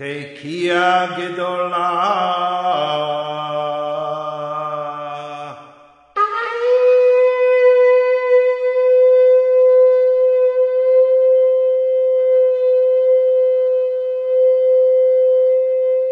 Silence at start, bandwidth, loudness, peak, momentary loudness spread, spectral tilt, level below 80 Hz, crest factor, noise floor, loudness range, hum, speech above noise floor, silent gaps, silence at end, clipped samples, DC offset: 0 s; 6.4 kHz; -15 LUFS; -2 dBFS; 12 LU; -5.5 dB/octave; -68 dBFS; 12 dB; -46 dBFS; 9 LU; none; 27 dB; none; 0 s; under 0.1%; under 0.1%